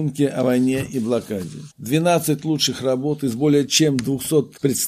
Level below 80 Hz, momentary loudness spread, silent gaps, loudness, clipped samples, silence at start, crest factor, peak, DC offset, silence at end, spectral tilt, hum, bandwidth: -58 dBFS; 7 LU; none; -20 LUFS; under 0.1%; 0 s; 16 dB; -4 dBFS; under 0.1%; 0 s; -4.5 dB/octave; none; 15.5 kHz